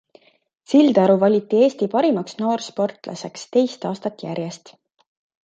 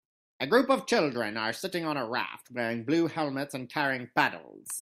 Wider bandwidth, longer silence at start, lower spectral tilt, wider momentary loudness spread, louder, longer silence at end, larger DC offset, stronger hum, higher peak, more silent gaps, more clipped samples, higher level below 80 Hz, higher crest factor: second, 9 kHz vs 15.5 kHz; first, 0.7 s vs 0.4 s; first, -6.5 dB/octave vs -4 dB/octave; first, 16 LU vs 9 LU; first, -19 LUFS vs -29 LUFS; first, 0.85 s vs 0 s; neither; neither; first, -2 dBFS vs -8 dBFS; neither; neither; about the same, -72 dBFS vs -76 dBFS; about the same, 18 dB vs 22 dB